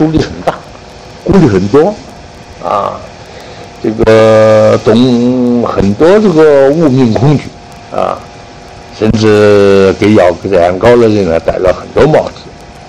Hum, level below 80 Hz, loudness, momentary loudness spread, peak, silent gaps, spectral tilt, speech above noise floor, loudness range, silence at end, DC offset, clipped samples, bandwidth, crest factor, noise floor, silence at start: none; -32 dBFS; -8 LUFS; 17 LU; 0 dBFS; none; -7 dB/octave; 23 dB; 5 LU; 0 s; under 0.1%; 2%; 11 kHz; 8 dB; -30 dBFS; 0 s